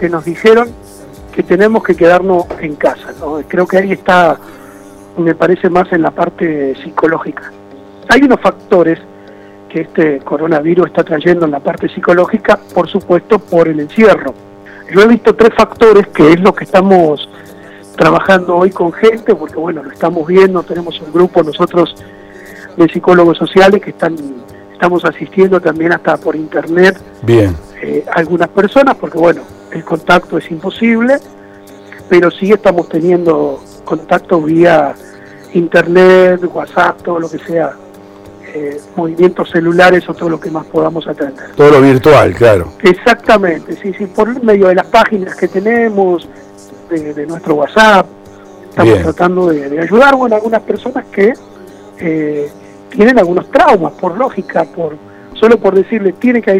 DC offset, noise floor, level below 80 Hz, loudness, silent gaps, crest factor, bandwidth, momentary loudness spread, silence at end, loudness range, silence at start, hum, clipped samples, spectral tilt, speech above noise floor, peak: under 0.1%; -34 dBFS; -42 dBFS; -10 LUFS; none; 10 dB; 14 kHz; 13 LU; 0 s; 4 LU; 0 s; none; 0.5%; -6.5 dB/octave; 25 dB; 0 dBFS